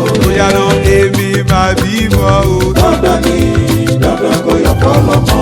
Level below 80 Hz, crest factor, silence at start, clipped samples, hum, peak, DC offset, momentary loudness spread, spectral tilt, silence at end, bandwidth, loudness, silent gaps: -20 dBFS; 10 dB; 0 s; under 0.1%; none; 0 dBFS; under 0.1%; 2 LU; -6 dB/octave; 0 s; 19.5 kHz; -10 LUFS; none